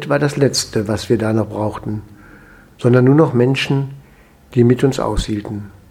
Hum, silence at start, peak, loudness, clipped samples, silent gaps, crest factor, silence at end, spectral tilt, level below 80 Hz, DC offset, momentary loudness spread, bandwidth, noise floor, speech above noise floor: none; 0 s; 0 dBFS; -16 LUFS; under 0.1%; none; 16 dB; 0.2 s; -6 dB/octave; -36 dBFS; under 0.1%; 14 LU; 15 kHz; -46 dBFS; 31 dB